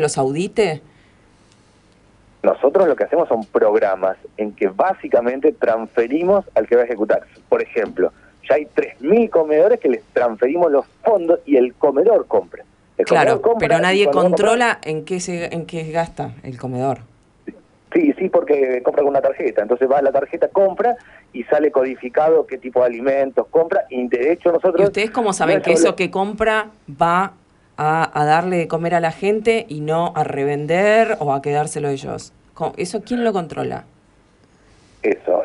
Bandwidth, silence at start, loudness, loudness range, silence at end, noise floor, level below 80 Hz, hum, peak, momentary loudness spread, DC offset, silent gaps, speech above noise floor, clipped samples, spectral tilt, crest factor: 11.5 kHz; 0 s; -18 LUFS; 4 LU; 0 s; -53 dBFS; -54 dBFS; none; -2 dBFS; 9 LU; under 0.1%; none; 36 dB; under 0.1%; -5.5 dB/octave; 16 dB